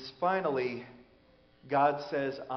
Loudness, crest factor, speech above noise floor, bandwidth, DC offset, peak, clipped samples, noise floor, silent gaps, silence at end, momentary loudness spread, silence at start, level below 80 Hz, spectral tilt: -31 LUFS; 18 dB; 32 dB; 6.4 kHz; under 0.1%; -14 dBFS; under 0.1%; -63 dBFS; none; 0 s; 11 LU; 0 s; -70 dBFS; -4 dB/octave